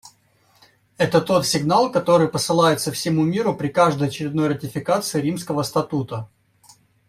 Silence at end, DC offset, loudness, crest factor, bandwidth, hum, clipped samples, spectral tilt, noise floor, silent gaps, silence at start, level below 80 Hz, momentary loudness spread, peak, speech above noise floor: 0.85 s; under 0.1%; -20 LUFS; 18 dB; 16 kHz; none; under 0.1%; -5 dB/octave; -59 dBFS; none; 0.05 s; -58 dBFS; 7 LU; -2 dBFS; 40 dB